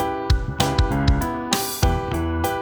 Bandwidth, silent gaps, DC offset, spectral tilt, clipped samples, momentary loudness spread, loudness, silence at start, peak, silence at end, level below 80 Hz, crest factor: over 20 kHz; none; under 0.1%; -5 dB/octave; under 0.1%; 3 LU; -22 LUFS; 0 s; -2 dBFS; 0 s; -26 dBFS; 18 dB